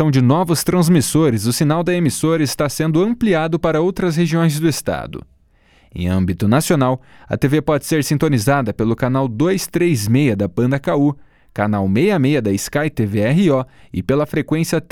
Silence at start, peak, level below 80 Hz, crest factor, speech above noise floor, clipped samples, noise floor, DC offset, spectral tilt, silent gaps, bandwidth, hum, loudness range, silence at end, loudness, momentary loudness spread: 0 s; 0 dBFS; -44 dBFS; 16 dB; 37 dB; under 0.1%; -53 dBFS; under 0.1%; -6 dB/octave; none; 18 kHz; none; 3 LU; 0.1 s; -17 LUFS; 6 LU